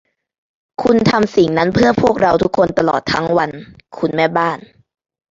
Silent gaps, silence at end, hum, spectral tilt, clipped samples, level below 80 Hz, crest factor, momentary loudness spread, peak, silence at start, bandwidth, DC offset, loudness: none; 0.75 s; none; -6.5 dB/octave; under 0.1%; -46 dBFS; 14 dB; 10 LU; 0 dBFS; 0.8 s; 7.8 kHz; under 0.1%; -15 LUFS